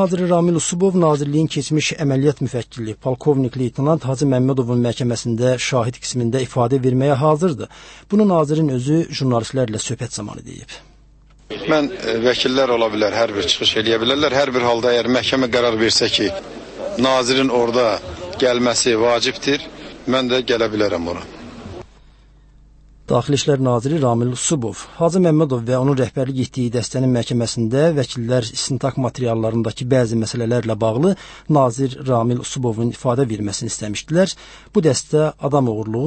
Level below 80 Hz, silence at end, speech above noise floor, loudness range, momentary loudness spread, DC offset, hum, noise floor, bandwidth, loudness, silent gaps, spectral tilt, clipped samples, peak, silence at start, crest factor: -48 dBFS; 0 s; 30 dB; 5 LU; 10 LU; under 0.1%; none; -48 dBFS; 8.8 kHz; -18 LUFS; none; -5 dB/octave; under 0.1%; -2 dBFS; 0 s; 16 dB